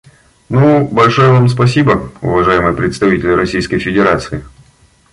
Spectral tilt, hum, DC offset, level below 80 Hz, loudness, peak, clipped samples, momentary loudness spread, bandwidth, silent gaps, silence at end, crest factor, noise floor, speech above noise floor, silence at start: -7 dB/octave; none; under 0.1%; -36 dBFS; -11 LUFS; 0 dBFS; under 0.1%; 7 LU; 11.5 kHz; none; 0.65 s; 12 dB; -48 dBFS; 37 dB; 0.5 s